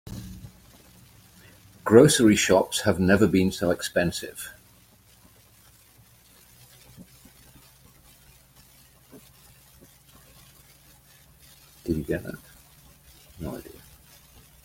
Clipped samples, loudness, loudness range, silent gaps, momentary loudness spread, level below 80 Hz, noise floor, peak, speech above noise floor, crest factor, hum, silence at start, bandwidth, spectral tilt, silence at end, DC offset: under 0.1%; -22 LUFS; 16 LU; none; 24 LU; -54 dBFS; -56 dBFS; -2 dBFS; 35 dB; 26 dB; none; 0.05 s; 16.5 kHz; -5 dB/octave; 0.95 s; under 0.1%